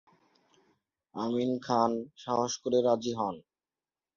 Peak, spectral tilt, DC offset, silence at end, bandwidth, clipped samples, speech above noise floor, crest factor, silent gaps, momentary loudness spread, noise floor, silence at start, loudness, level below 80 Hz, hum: -12 dBFS; -5 dB/octave; under 0.1%; 0.75 s; 7.4 kHz; under 0.1%; over 60 dB; 20 dB; none; 10 LU; under -90 dBFS; 1.15 s; -30 LUFS; -72 dBFS; none